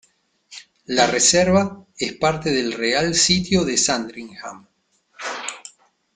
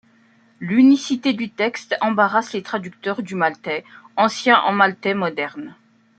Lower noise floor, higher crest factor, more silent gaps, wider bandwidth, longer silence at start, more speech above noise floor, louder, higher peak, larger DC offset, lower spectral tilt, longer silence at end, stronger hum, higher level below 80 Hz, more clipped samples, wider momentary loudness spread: first, -62 dBFS vs -55 dBFS; about the same, 18 dB vs 18 dB; neither; about the same, 9.6 kHz vs 8.8 kHz; about the same, 0.5 s vs 0.6 s; first, 43 dB vs 36 dB; about the same, -19 LUFS vs -19 LUFS; about the same, -2 dBFS vs -2 dBFS; neither; second, -3 dB/octave vs -5 dB/octave; about the same, 0.45 s vs 0.45 s; neither; first, -50 dBFS vs -70 dBFS; neither; first, 21 LU vs 14 LU